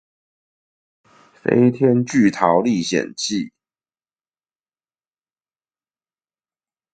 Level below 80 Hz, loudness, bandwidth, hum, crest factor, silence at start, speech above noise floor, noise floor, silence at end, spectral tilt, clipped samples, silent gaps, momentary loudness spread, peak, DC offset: -62 dBFS; -18 LUFS; 9.2 kHz; none; 22 dB; 1.45 s; over 73 dB; under -90 dBFS; 3.45 s; -5.5 dB/octave; under 0.1%; none; 10 LU; 0 dBFS; under 0.1%